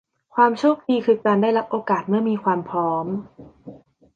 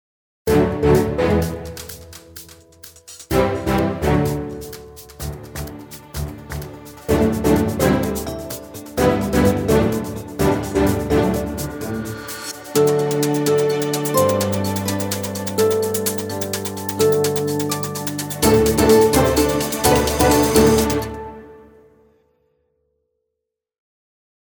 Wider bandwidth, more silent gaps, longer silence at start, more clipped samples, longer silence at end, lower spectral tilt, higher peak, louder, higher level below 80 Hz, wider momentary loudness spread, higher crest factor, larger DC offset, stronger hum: second, 7.6 kHz vs 19 kHz; neither; about the same, 0.35 s vs 0.45 s; neither; second, 0.4 s vs 2.95 s; first, -7.5 dB/octave vs -5 dB/octave; second, -4 dBFS vs 0 dBFS; about the same, -21 LUFS vs -19 LUFS; second, -64 dBFS vs -34 dBFS; second, 8 LU vs 17 LU; about the same, 18 dB vs 20 dB; neither; neither